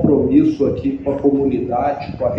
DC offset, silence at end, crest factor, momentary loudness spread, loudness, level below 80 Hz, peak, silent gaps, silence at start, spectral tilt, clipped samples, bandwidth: under 0.1%; 0 s; 14 dB; 8 LU; -17 LUFS; -40 dBFS; -2 dBFS; none; 0 s; -10 dB/octave; under 0.1%; 6.2 kHz